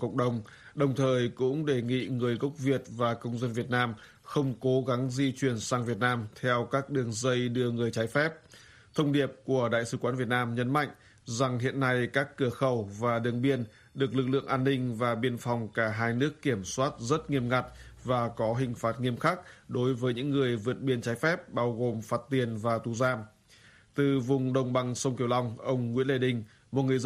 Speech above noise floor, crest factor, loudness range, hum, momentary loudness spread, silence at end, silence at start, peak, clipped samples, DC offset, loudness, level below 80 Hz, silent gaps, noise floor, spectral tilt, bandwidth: 29 dB; 18 dB; 1 LU; none; 5 LU; 0 s; 0 s; -12 dBFS; under 0.1%; under 0.1%; -30 LUFS; -62 dBFS; none; -58 dBFS; -6 dB/octave; 13.5 kHz